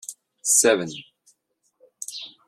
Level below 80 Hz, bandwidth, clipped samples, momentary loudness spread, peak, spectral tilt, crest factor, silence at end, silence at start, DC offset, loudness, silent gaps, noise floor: -70 dBFS; 14.5 kHz; under 0.1%; 22 LU; -4 dBFS; -1.5 dB/octave; 22 dB; 0.2 s; 0.1 s; under 0.1%; -19 LUFS; none; -70 dBFS